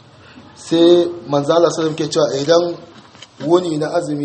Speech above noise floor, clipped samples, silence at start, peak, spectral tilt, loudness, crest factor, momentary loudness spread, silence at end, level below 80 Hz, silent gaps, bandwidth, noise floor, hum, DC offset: 27 dB; under 0.1%; 0.35 s; 0 dBFS; -5.5 dB/octave; -16 LUFS; 16 dB; 11 LU; 0 s; -60 dBFS; none; 8.8 kHz; -42 dBFS; none; under 0.1%